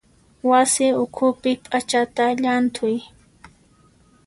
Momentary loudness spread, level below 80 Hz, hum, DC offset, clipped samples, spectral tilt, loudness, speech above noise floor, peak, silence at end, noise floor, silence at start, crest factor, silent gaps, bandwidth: 8 LU; -60 dBFS; none; under 0.1%; under 0.1%; -3 dB/octave; -20 LUFS; 36 dB; -4 dBFS; 1.2 s; -55 dBFS; 0.45 s; 16 dB; none; 11.5 kHz